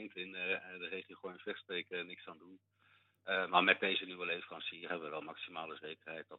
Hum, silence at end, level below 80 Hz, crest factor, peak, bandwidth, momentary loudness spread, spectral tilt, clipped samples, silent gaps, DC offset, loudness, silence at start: none; 0 s; under -90 dBFS; 28 dB; -12 dBFS; 4.9 kHz; 18 LU; 0 dB/octave; under 0.1%; none; under 0.1%; -38 LUFS; 0 s